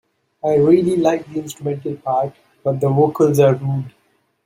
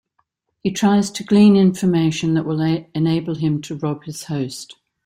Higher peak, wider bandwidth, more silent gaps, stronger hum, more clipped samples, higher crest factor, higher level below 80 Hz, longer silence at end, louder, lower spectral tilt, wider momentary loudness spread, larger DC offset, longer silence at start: about the same, -2 dBFS vs -4 dBFS; first, 16 kHz vs 13 kHz; neither; neither; neither; about the same, 16 dB vs 14 dB; about the same, -58 dBFS vs -56 dBFS; first, 0.55 s vs 0.35 s; about the same, -18 LUFS vs -18 LUFS; first, -8 dB/octave vs -6.5 dB/octave; about the same, 12 LU vs 14 LU; neither; second, 0.45 s vs 0.65 s